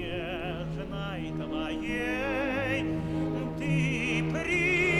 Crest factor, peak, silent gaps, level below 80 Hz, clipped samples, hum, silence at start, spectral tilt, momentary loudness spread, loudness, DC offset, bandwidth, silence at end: 14 dB; -16 dBFS; none; -46 dBFS; under 0.1%; none; 0 s; -6 dB/octave; 8 LU; -30 LUFS; under 0.1%; 12.5 kHz; 0 s